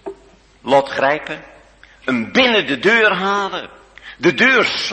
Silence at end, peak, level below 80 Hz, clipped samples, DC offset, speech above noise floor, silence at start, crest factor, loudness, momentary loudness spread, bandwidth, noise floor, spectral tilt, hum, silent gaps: 0 s; 0 dBFS; -54 dBFS; under 0.1%; under 0.1%; 33 dB; 0.05 s; 16 dB; -15 LUFS; 18 LU; 8.8 kHz; -48 dBFS; -4 dB/octave; none; none